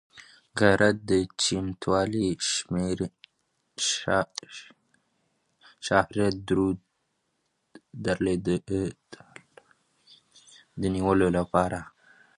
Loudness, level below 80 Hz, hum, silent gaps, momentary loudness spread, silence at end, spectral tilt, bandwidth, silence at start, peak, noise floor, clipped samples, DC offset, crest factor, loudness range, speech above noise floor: -26 LUFS; -50 dBFS; none; none; 15 LU; 0.5 s; -4.5 dB/octave; 11.5 kHz; 0.15 s; -4 dBFS; -76 dBFS; under 0.1%; under 0.1%; 24 dB; 7 LU; 50 dB